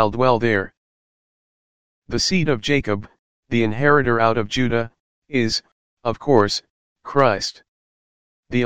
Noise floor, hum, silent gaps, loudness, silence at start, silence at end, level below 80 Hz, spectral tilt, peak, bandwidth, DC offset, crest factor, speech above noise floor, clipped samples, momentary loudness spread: under -90 dBFS; none; 0.77-2.02 s, 3.19-3.43 s, 5.00-5.22 s, 5.72-5.97 s, 6.70-6.96 s, 7.68-8.43 s; -20 LUFS; 0 s; 0 s; -46 dBFS; -5 dB/octave; 0 dBFS; 15.5 kHz; 2%; 20 dB; over 71 dB; under 0.1%; 11 LU